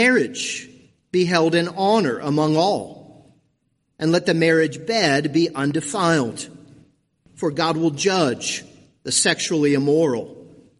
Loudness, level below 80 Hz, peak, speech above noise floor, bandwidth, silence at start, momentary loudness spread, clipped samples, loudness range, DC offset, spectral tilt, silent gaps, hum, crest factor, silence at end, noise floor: -20 LUFS; -62 dBFS; -4 dBFS; 50 dB; 11.5 kHz; 0 s; 10 LU; under 0.1%; 2 LU; under 0.1%; -4 dB/octave; none; none; 18 dB; 0.35 s; -69 dBFS